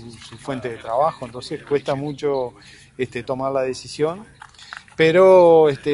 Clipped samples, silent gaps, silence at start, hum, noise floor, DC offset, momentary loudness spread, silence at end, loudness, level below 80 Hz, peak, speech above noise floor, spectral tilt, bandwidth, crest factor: under 0.1%; none; 0 s; none; -40 dBFS; under 0.1%; 23 LU; 0 s; -18 LUFS; -56 dBFS; -2 dBFS; 22 dB; -6 dB/octave; 11.5 kHz; 18 dB